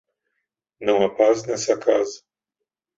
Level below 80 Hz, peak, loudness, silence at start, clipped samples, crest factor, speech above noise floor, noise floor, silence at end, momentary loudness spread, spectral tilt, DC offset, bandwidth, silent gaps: -64 dBFS; -4 dBFS; -21 LUFS; 0.8 s; under 0.1%; 20 dB; 64 dB; -84 dBFS; 0.8 s; 10 LU; -4 dB/octave; under 0.1%; 8 kHz; none